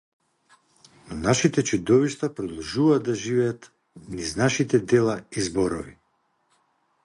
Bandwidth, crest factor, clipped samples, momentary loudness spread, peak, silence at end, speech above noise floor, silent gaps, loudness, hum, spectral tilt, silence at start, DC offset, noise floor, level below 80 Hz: 11.5 kHz; 20 dB; under 0.1%; 12 LU; -6 dBFS; 1.1 s; 47 dB; none; -23 LUFS; none; -5 dB/octave; 1.05 s; under 0.1%; -70 dBFS; -52 dBFS